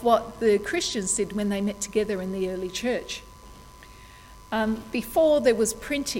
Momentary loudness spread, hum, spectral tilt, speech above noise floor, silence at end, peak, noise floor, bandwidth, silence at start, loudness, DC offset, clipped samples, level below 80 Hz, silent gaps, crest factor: 9 LU; none; -3.5 dB/octave; 22 dB; 0 s; -6 dBFS; -47 dBFS; 17 kHz; 0 s; -25 LUFS; under 0.1%; under 0.1%; -50 dBFS; none; 20 dB